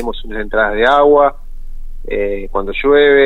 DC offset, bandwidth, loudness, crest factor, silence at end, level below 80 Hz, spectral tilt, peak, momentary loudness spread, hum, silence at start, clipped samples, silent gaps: under 0.1%; 4.2 kHz; -13 LUFS; 12 dB; 0 s; -26 dBFS; -6 dB/octave; 0 dBFS; 14 LU; none; 0 s; under 0.1%; none